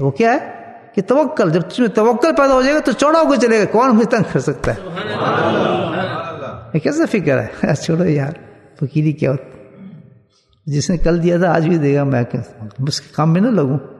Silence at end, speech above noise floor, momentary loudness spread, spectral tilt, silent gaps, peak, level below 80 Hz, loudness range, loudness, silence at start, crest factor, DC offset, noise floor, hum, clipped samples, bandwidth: 0 s; 38 dB; 11 LU; -6.5 dB/octave; none; 0 dBFS; -38 dBFS; 6 LU; -16 LUFS; 0 s; 16 dB; under 0.1%; -54 dBFS; none; under 0.1%; 12 kHz